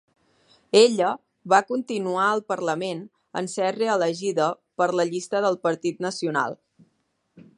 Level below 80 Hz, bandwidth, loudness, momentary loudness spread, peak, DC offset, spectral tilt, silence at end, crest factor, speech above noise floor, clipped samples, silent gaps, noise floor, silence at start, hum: -76 dBFS; 11.5 kHz; -24 LUFS; 11 LU; -2 dBFS; under 0.1%; -4 dB/octave; 0.15 s; 22 dB; 48 dB; under 0.1%; none; -71 dBFS; 0.75 s; none